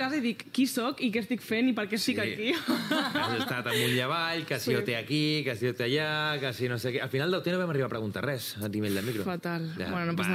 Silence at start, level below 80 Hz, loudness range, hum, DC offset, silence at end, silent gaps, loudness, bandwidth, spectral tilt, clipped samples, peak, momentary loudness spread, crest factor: 0 s; -70 dBFS; 3 LU; none; under 0.1%; 0 s; none; -30 LUFS; 16 kHz; -5 dB/octave; under 0.1%; -14 dBFS; 5 LU; 16 dB